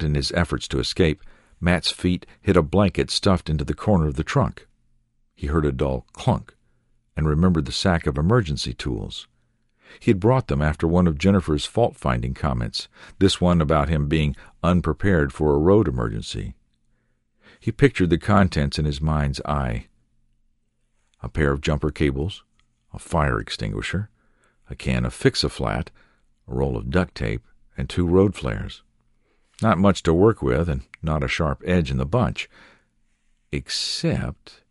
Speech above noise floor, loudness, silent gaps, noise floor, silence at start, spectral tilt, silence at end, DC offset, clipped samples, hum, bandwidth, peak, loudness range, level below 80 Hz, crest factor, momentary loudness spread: 46 dB; -22 LUFS; none; -67 dBFS; 0 s; -6.5 dB/octave; 0.2 s; under 0.1%; under 0.1%; none; 11.5 kHz; -2 dBFS; 5 LU; -34 dBFS; 20 dB; 13 LU